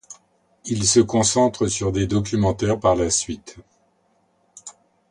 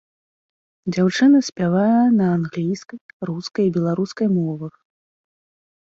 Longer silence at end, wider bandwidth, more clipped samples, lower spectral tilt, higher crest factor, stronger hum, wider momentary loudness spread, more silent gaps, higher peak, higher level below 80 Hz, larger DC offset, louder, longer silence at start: second, 0.4 s vs 1.15 s; first, 11.5 kHz vs 7.8 kHz; neither; second, -4.5 dB/octave vs -7 dB/octave; about the same, 18 dB vs 14 dB; neither; first, 23 LU vs 16 LU; second, none vs 1.52-1.56 s, 3.01-3.20 s; about the same, -4 dBFS vs -6 dBFS; first, -42 dBFS vs -62 dBFS; neither; about the same, -20 LUFS vs -19 LUFS; second, 0.1 s vs 0.85 s